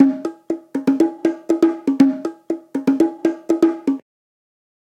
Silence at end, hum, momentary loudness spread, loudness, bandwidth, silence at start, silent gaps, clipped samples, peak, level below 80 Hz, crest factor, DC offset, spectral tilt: 0.95 s; none; 11 LU; -19 LUFS; 10 kHz; 0 s; none; under 0.1%; 0 dBFS; -66 dBFS; 18 dB; under 0.1%; -6.5 dB/octave